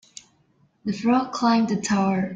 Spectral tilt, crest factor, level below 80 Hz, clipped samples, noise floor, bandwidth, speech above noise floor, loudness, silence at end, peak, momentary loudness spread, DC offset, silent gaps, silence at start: -5.5 dB/octave; 16 dB; -62 dBFS; under 0.1%; -63 dBFS; 9.4 kHz; 41 dB; -22 LUFS; 0 s; -8 dBFS; 8 LU; under 0.1%; none; 0.85 s